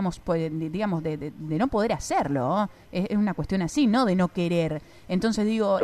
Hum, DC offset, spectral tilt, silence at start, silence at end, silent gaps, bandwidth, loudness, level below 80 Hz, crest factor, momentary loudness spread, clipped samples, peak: none; under 0.1%; -6.5 dB/octave; 0 s; 0 s; none; 13 kHz; -26 LUFS; -48 dBFS; 14 dB; 8 LU; under 0.1%; -10 dBFS